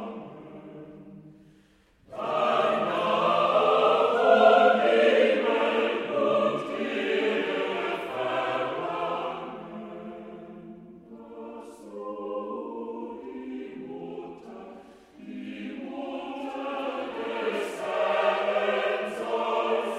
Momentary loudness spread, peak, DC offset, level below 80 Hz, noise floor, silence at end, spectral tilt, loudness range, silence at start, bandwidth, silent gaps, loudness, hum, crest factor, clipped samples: 23 LU; -6 dBFS; under 0.1%; -70 dBFS; -60 dBFS; 0 s; -5 dB/octave; 17 LU; 0 s; 12.5 kHz; none; -26 LUFS; none; 22 dB; under 0.1%